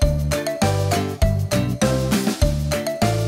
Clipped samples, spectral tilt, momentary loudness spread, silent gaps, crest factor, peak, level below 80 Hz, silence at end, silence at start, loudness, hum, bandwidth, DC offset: under 0.1%; -5.5 dB/octave; 3 LU; none; 14 dB; -6 dBFS; -28 dBFS; 0 s; 0 s; -21 LUFS; none; 16.5 kHz; under 0.1%